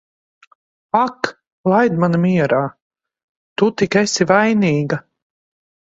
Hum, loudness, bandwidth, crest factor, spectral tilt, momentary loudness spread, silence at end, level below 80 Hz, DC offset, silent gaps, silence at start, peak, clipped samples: none; -17 LUFS; 8 kHz; 18 dB; -5.5 dB/octave; 12 LU; 0.95 s; -58 dBFS; under 0.1%; 1.47-1.64 s, 2.82-2.91 s, 3.23-3.56 s; 0.95 s; 0 dBFS; under 0.1%